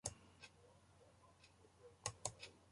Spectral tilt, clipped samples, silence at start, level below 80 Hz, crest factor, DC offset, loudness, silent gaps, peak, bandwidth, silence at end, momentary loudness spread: -2 dB/octave; under 0.1%; 0.05 s; -72 dBFS; 32 dB; under 0.1%; -52 LUFS; none; -24 dBFS; 11.5 kHz; 0 s; 21 LU